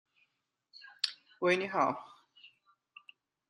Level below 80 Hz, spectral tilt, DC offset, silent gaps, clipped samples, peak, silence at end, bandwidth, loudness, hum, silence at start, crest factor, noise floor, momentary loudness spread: -86 dBFS; -4 dB/octave; under 0.1%; none; under 0.1%; -10 dBFS; 1.05 s; 11.5 kHz; -33 LUFS; none; 0.85 s; 26 dB; -81 dBFS; 26 LU